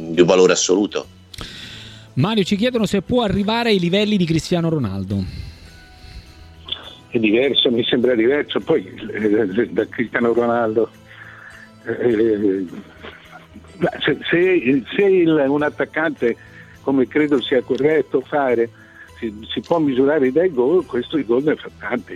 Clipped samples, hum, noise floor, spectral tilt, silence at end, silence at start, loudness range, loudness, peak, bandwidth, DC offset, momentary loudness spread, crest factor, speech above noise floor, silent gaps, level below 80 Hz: under 0.1%; none; -42 dBFS; -5 dB/octave; 0 s; 0 s; 4 LU; -18 LUFS; -2 dBFS; 12.5 kHz; under 0.1%; 16 LU; 18 dB; 24 dB; none; -48 dBFS